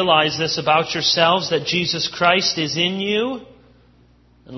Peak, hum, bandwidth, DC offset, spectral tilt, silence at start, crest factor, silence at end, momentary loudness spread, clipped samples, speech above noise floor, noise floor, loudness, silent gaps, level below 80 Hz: 0 dBFS; 60 Hz at -50 dBFS; 6.2 kHz; under 0.1%; -3.5 dB/octave; 0 s; 20 dB; 0 s; 5 LU; under 0.1%; 34 dB; -53 dBFS; -18 LUFS; none; -56 dBFS